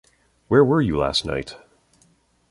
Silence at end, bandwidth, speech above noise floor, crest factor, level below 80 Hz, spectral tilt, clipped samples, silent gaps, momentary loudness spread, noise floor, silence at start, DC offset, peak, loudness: 0.95 s; 11.5 kHz; 41 dB; 20 dB; -44 dBFS; -6 dB/octave; under 0.1%; none; 13 LU; -61 dBFS; 0.5 s; under 0.1%; -4 dBFS; -20 LUFS